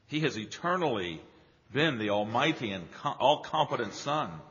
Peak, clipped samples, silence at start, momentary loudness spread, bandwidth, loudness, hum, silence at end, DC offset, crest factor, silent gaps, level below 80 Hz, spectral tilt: -10 dBFS; under 0.1%; 0.1 s; 9 LU; 7.2 kHz; -30 LUFS; none; 0 s; under 0.1%; 20 dB; none; -68 dBFS; -3 dB/octave